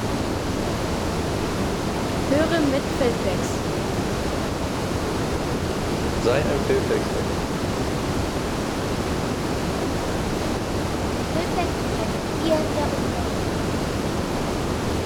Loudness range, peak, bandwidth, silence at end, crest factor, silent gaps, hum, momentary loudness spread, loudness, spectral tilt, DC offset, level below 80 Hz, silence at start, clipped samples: 2 LU; -8 dBFS; 20 kHz; 0 s; 16 dB; none; none; 4 LU; -24 LUFS; -5.5 dB/octave; under 0.1%; -36 dBFS; 0 s; under 0.1%